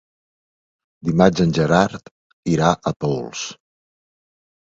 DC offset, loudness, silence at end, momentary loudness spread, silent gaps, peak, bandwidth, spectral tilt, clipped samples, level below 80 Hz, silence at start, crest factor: under 0.1%; -19 LUFS; 1.15 s; 14 LU; 2.11-2.43 s; 0 dBFS; 7.8 kHz; -6 dB/octave; under 0.1%; -48 dBFS; 1.05 s; 22 dB